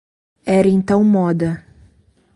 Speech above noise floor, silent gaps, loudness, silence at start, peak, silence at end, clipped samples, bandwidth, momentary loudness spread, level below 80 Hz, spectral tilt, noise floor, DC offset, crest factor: 40 dB; none; -16 LUFS; 0.45 s; -2 dBFS; 0.8 s; under 0.1%; 11 kHz; 13 LU; -50 dBFS; -8.5 dB/octave; -54 dBFS; under 0.1%; 14 dB